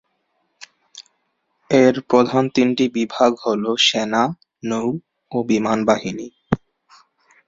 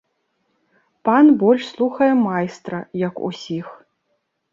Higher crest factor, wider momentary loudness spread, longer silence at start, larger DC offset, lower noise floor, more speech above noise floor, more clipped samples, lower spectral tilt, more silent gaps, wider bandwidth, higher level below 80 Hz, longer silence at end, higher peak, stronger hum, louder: about the same, 20 dB vs 16 dB; second, 12 LU vs 16 LU; about the same, 0.95 s vs 1.05 s; neither; about the same, -70 dBFS vs -71 dBFS; about the same, 52 dB vs 53 dB; neither; second, -4.5 dB/octave vs -7 dB/octave; neither; about the same, 7.8 kHz vs 7.4 kHz; first, -54 dBFS vs -66 dBFS; about the same, 0.9 s vs 0.8 s; first, 0 dBFS vs -4 dBFS; neither; about the same, -19 LUFS vs -18 LUFS